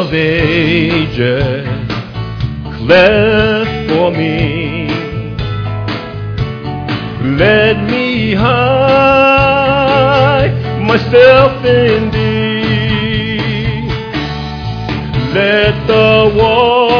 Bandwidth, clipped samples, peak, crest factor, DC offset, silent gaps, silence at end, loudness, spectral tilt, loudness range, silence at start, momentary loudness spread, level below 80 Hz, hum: 5.4 kHz; 0.2%; 0 dBFS; 12 dB; under 0.1%; none; 0 s; -11 LUFS; -7.5 dB/octave; 7 LU; 0 s; 12 LU; -30 dBFS; none